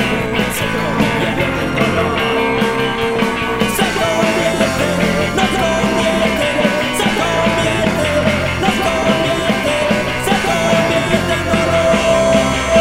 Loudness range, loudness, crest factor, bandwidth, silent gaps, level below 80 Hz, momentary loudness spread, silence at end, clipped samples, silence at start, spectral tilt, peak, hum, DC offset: 1 LU; -15 LUFS; 14 dB; 16 kHz; none; -34 dBFS; 3 LU; 0 s; under 0.1%; 0 s; -4.5 dB/octave; 0 dBFS; none; under 0.1%